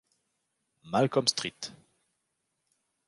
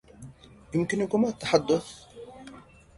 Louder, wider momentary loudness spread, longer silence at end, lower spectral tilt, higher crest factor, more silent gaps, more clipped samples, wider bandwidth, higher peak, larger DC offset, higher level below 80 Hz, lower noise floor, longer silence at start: about the same, -28 LUFS vs -27 LUFS; second, 17 LU vs 24 LU; first, 1.35 s vs 0.4 s; second, -3.5 dB/octave vs -5.5 dB/octave; about the same, 24 dB vs 22 dB; neither; neither; about the same, 11.5 kHz vs 11.5 kHz; about the same, -10 dBFS vs -8 dBFS; neither; second, -72 dBFS vs -58 dBFS; first, -81 dBFS vs -49 dBFS; first, 0.85 s vs 0.2 s